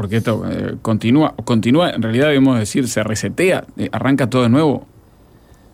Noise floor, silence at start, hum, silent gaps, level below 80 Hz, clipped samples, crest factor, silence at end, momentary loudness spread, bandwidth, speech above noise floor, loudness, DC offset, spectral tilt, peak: -47 dBFS; 0 s; none; none; -48 dBFS; under 0.1%; 12 dB; 0.9 s; 7 LU; 16 kHz; 31 dB; -16 LUFS; under 0.1%; -6 dB/octave; -4 dBFS